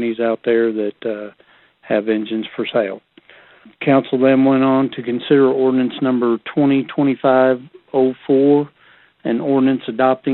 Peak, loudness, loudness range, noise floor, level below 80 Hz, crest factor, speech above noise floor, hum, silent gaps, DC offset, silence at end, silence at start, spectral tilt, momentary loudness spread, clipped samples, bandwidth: -2 dBFS; -17 LUFS; 6 LU; -51 dBFS; -64 dBFS; 16 dB; 35 dB; none; none; under 0.1%; 0 s; 0 s; -11.5 dB/octave; 10 LU; under 0.1%; 4.2 kHz